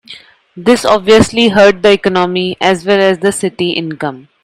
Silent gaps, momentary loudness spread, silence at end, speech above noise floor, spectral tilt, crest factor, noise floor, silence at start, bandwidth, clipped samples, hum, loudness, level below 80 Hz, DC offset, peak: none; 10 LU; 0.25 s; 26 dB; -4.5 dB/octave; 12 dB; -36 dBFS; 0.1 s; 13.5 kHz; 0.4%; none; -11 LUFS; -42 dBFS; under 0.1%; 0 dBFS